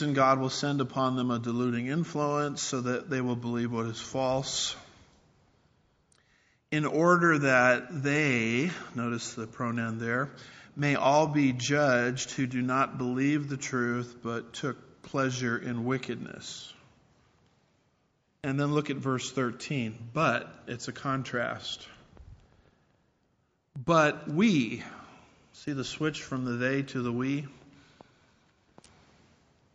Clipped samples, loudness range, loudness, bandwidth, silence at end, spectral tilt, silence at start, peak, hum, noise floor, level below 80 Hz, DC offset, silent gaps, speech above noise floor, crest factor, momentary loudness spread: under 0.1%; 9 LU; -29 LUFS; 8 kHz; 2.15 s; -4.5 dB/octave; 0 s; -8 dBFS; none; -73 dBFS; -66 dBFS; under 0.1%; none; 44 dB; 22 dB; 14 LU